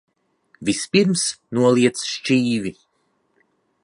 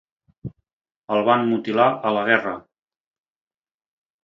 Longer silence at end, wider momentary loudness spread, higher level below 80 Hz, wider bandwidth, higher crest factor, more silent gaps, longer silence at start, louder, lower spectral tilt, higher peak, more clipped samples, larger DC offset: second, 1.1 s vs 1.65 s; second, 9 LU vs 20 LU; about the same, -60 dBFS vs -62 dBFS; first, 11.5 kHz vs 7.2 kHz; about the same, 20 dB vs 22 dB; second, none vs 0.73-0.80 s, 0.96-1.08 s; first, 0.6 s vs 0.45 s; about the same, -20 LUFS vs -20 LUFS; second, -4.5 dB/octave vs -7.5 dB/octave; about the same, -2 dBFS vs -2 dBFS; neither; neither